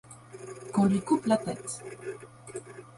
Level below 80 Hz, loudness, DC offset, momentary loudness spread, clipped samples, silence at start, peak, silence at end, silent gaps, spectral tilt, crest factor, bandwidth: -64 dBFS; -29 LUFS; under 0.1%; 19 LU; under 0.1%; 0.1 s; -14 dBFS; 0.05 s; none; -6 dB/octave; 18 dB; 11.5 kHz